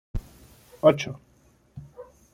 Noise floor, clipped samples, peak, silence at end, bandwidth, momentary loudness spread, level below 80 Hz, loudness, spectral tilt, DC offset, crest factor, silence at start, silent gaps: -60 dBFS; under 0.1%; -4 dBFS; 0.3 s; 15.5 kHz; 26 LU; -44 dBFS; -23 LUFS; -6 dB/octave; under 0.1%; 24 dB; 0.15 s; none